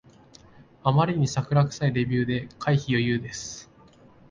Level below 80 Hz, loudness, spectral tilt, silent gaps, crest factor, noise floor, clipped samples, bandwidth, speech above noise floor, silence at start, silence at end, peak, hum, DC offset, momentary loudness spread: -54 dBFS; -25 LUFS; -6 dB/octave; none; 20 dB; -53 dBFS; under 0.1%; 7.6 kHz; 29 dB; 0.85 s; 0.7 s; -6 dBFS; none; under 0.1%; 12 LU